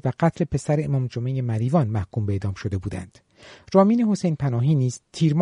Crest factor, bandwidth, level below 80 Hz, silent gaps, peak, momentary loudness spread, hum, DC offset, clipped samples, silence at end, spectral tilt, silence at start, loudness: 18 dB; 11 kHz; -50 dBFS; none; -4 dBFS; 9 LU; none; under 0.1%; under 0.1%; 0 s; -8 dB/octave; 0.05 s; -23 LUFS